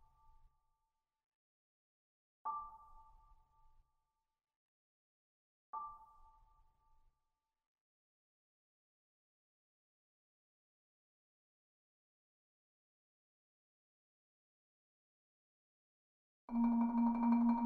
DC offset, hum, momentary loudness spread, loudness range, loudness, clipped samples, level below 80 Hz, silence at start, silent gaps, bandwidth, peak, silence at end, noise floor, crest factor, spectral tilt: under 0.1%; none; 18 LU; 17 LU; -37 LUFS; under 0.1%; -72 dBFS; 2.45 s; 4.56-5.73 s, 7.66-7.75 s, 7.81-16.48 s; 2.5 kHz; -24 dBFS; 0 s; -89 dBFS; 22 dB; -8.5 dB/octave